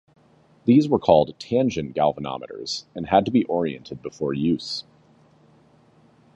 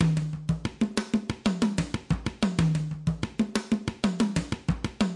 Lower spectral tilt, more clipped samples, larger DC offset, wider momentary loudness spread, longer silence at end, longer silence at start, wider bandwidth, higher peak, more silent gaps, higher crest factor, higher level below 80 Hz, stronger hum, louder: about the same, -6.5 dB/octave vs -6 dB/octave; neither; neither; first, 14 LU vs 5 LU; first, 1.55 s vs 0 s; first, 0.65 s vs 0 s; second, 8.4 kHz vs 11.5 kHz; first, -2 dBFS vs -10 dBFS; neither; first, 22 dB vs 16 dB; second, -54 dBFS vs -44 dBFS; neither; first, -22 LUFS vs -29 LUFS